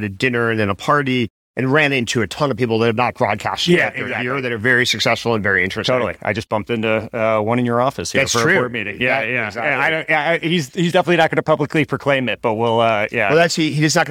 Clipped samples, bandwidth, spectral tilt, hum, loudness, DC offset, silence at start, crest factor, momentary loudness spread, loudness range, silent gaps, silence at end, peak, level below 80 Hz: under 0.1%; 16.5 kHz; -4.5 dB/octave; none; -17 LUFS; under 0.1%; 0 s; 16 dB; 6 LU; 1 LU; 1.30-1.54 s; 0 s; -2 dBFS; -54 dBFS